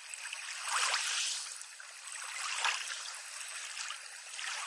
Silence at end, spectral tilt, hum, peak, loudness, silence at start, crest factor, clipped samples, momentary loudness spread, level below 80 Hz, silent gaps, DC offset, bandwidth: 0 s; 9 dB/octave; none; -18 dBFS; -36 LUFS; 0 s; 22 dB; under 0.1%; 12 LU; under -90 dBFS; none; under 0.1%; 11.5 kHz